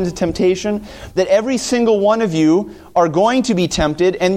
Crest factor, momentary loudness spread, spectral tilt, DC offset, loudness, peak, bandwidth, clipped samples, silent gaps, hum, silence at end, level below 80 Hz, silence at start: 12 dB; 6 LU; -5 dB/octave; under 0.1%; -16 LUFS; -2 dBFS; 15 kHz; under 0.1%; none; none; 0 s; -38 dBFS; 0 s